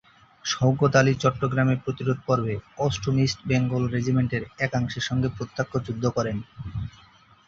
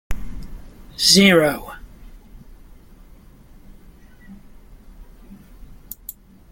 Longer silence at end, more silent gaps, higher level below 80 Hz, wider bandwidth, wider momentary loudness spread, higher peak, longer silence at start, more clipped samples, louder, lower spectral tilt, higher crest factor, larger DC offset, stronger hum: first, 0.6 s vs 0.4 s; neither; second, -48 dBFS vs -40 dBFS; second, 7.6 kHz vs 17 kHz; second, 11 LU vs 28 LU; second, -4 dBFS vs 0 dBFS; first, 0.45 s vs 0.1 s; neither; second, -25 LUFS vs -14 LUFS; first, -6 dB/octave vs -3.5 dB/octave; about the same, 20 dB vs 22 dB; neither; neither